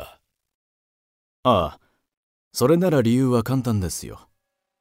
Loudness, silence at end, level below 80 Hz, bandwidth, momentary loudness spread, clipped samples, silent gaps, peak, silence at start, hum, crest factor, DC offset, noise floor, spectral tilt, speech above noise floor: -21 LUFS; 0.65 s; -48 dBFS; 16 kHz; 13 LU; under 0.1%; 0.55-1.43 s, 2.17-2.51 s; -6 dBFS; 0 s; none; 18 dB; under 0.1%; -75 dBFS; -6.5 dB/octave; 55 dB